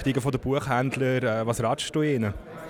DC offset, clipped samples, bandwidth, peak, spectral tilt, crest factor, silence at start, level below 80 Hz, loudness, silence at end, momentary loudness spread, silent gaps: under 0.1%; under 0.1%; 18 kHz; -10 dBFS; -6 dB/octave; 14 dB; 0 s; -48 dBFS; -26 LUFS; 0 s; 3 LU; none